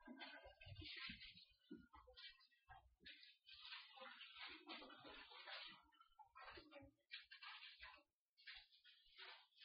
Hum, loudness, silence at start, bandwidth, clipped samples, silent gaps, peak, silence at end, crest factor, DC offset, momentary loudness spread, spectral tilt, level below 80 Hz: none; -60 LUFS; 0 s; 5.4 kHz; under 0.1%; 8.14-8.36 s; -40 dBFS; 0 s; 22 dB; under 0.1%; 11 LU; -0.5 dB/octave; -80 dBFS